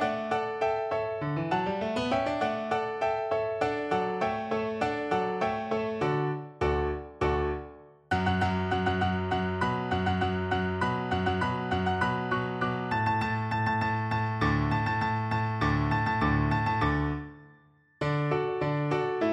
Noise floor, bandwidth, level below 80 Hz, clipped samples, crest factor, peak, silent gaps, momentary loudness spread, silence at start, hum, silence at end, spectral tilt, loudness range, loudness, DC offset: -60 dBFS; 9.6 kHz; -44 dBFS; under 0.1%; 16 dB; -14 dBFS; none; 4 LU; 0 s; none; 0 s; -7.5 dB/octave; 2 LU; -29 LUFS; under 0.1%